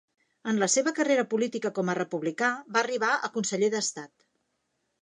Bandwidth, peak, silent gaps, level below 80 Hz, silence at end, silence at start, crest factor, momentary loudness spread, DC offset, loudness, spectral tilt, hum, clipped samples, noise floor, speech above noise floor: 11 kHz; -10 dBFS; none; -82 dBFS; 0.95 s; 0.45 s; 20 dB; 6 LU; under 0.1%; -27 LUFS; -3.5 dB/octave; none; under 0.1%; -77 dBFS; 50 dB